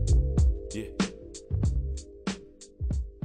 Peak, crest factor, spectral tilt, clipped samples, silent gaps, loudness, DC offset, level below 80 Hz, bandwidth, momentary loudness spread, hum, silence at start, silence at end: -14 dBFS; 14 dB; -6.5 dB/octave; under 0.1%; none; -31 LUFS; under 0.1%; -30 dBFS; 9.8 kHz; 13 LU; none; 0 s; 0.05 s